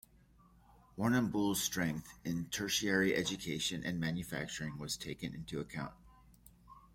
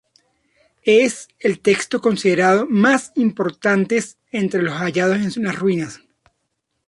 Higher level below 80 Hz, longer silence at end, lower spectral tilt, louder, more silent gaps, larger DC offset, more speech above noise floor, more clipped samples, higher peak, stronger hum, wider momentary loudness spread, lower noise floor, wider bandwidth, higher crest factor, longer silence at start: about the same, -62 dBFS vs -62 dBFS; second, 0.15 s vs 0.9 s; about the same, -4 dB/octave vs -5 dB/octave; second, -36 LUFS vs -18 LUFS; neither; neither; second, 28 dB vs 56 dB; neither; second, -18 dBFS vs -2 dBFS; neither; first, 11 LU vs 8 LU; second, -65 dBFS vs -73 dBFS; first, 16.5 kHz vs 11.5 kHz; about the same, 20 dB vs 16 dB; about the same, 0.95 s vs 0.85 s